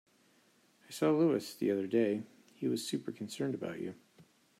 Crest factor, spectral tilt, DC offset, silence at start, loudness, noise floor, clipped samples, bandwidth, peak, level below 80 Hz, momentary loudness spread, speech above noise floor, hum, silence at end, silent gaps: 18 dB; -6 dB/octave; under 0.1%; 0.9 s; -34 LUFS; -69 dBFS; under 0.1%; 15.5 kHz; -18 dBFS; -84 dBFS; 13 LU; 35 dB; none; 0.4 s; none